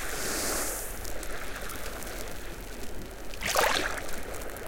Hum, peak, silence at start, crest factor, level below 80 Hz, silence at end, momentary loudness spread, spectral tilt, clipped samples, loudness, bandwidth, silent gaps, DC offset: none; -10 dBFS; 0 s; 22 dB; -42 dBFS; 0 s; 15 LU; -2 dB/octave; under 0.1%; -32 LUFS; 17 kHz; none; under 0.1%